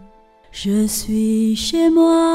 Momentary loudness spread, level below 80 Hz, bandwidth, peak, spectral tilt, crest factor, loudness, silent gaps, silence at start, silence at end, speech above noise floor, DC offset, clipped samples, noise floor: 9 LU; -42 dBFS; 16 kHz; -4 dBFS; -5 dB/octave; 12 dB; -17 LUFS; none; 0.55 s; 0 s; 31 dB; under 0.1%; under 0.1%; -47 dBFS